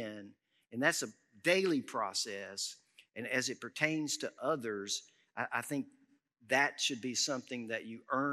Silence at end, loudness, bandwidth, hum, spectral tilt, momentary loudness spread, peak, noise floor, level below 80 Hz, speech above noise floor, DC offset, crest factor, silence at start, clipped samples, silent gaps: 0 s; -35 LUFS; 15.5 kHz; none; -2.5 dB/octave; 14 LU; -14 dBFS; -69 dBFS; under -90 dBFS; 33 dB; under 0.1%; 24 dB; 0 s; under 0.1%; none